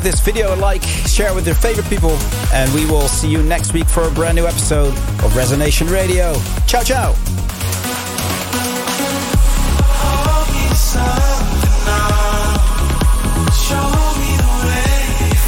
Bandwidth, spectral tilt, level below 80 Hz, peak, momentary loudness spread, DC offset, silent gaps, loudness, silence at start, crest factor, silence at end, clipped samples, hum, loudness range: 17 kHz; -4.5 dB/octave; -16 dBFS; -2 dBFS; 3 LU; under 0.1%; none; -15 LUFS; 0 s; 10 dB; 0 s; under 0.1%; none; 2 LU